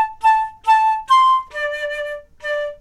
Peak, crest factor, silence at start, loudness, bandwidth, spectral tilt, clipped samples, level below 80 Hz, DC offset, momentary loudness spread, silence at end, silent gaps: -6 dBFS; 12 dB; 0 s; -17 LUFS; 12 kHz; 0 dB/octave; under 0.1%; -52 dBFS; under 0.1%; 13 LU; 0.05 s; none